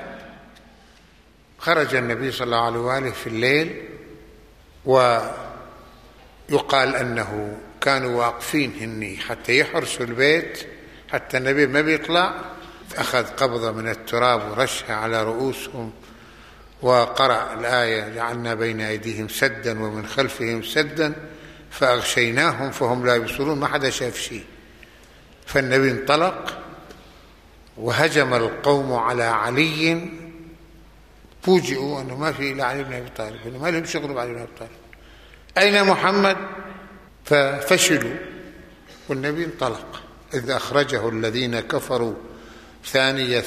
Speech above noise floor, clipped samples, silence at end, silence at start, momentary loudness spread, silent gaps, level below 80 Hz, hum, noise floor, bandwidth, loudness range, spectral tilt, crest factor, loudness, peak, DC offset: 31 dB; under 0.1%; 0 s; 0 s; 17 LU; none; -52 dBFS; none; -52 dBFS; 15 kHz; 4 LU; -4 dB/octave; 20 dB; -21 LUFS; -2 dBFS; under 0.1%